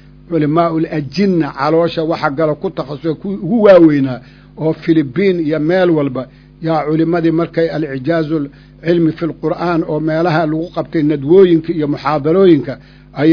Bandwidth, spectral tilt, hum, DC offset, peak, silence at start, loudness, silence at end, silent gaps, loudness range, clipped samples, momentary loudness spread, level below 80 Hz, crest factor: 5.4 kHz; -9 dB/octave; none; under 0.1%; 0 dBFS; 0.3 s; -14 LUFS; 0 s; none; 4 LU; 0.3%; 11 LU; -46 dBFS; 14 dB